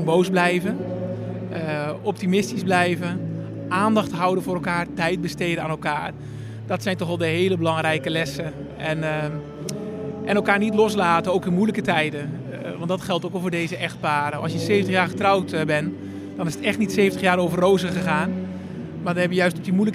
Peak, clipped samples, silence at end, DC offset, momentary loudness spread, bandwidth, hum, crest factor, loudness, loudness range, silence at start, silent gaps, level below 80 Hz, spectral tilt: -4 dBFS; under 0.1%; 0 s; under 0.1%; 11 LU; 15 kHz; none; 20 dB; -23 LUFS; 3 LU; 0 s; none; -56 dBFS; -6 dB/octave